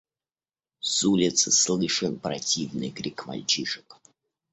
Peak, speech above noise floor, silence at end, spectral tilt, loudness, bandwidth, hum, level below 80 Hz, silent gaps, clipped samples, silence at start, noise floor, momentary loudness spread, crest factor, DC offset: -8 dBFS; over 64 dB; 0.6 s; -2.5 dB/octave; -24 LUFS; 8.4 kHz; none; -64 dBFS; none; under 0.1%; 0.85 s; under -90 dBFS; 13 LU; 20 dB; under 0.1%